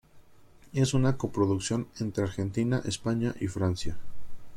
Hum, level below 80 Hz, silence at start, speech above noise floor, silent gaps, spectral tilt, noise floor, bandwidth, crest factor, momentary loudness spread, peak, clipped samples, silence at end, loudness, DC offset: none; -50 dBFS; 0.15 s; 26 dB; none; -6 dB/octave; -54 dBFS; 13 kHz; 16 dB; 8 LU; -14 dBFS; under 0.1%; 0 s; -30 LUFS; under 0.1%